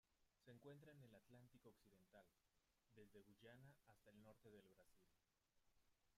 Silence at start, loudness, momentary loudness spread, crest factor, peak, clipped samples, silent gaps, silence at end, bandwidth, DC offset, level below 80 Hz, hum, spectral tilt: 0.05 s; -68 LUFS; 4 LU; 18 dB; -54 dBFS; under 0.1%; none; 0 s; 15 kHz; under 0.1%; -90 dBFS; none; -6 dB/octave